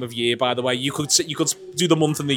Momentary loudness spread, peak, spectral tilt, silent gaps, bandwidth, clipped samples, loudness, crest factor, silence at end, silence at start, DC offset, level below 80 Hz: 5 LU; -4 dBFS; -3.5 dB/octave; none; 19 kHz; under 0.1%; -21 LUFS; 18 dB; 0 s; 0 s; under 0.1%; -64 dBFS